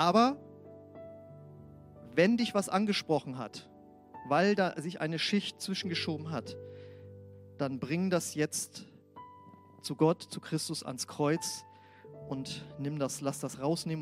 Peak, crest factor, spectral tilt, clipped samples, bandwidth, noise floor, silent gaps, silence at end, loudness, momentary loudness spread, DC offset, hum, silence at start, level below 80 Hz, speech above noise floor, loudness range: -12 dBFS; 22 dB; -4.5 dB/octave; under 0.1%; 16 kHz; -55 dBFS; none; 0 s; -32 LUFS; 24 LU; under 0.1%; none; 0 s; -72 dBFS; 23 dB; 5 LU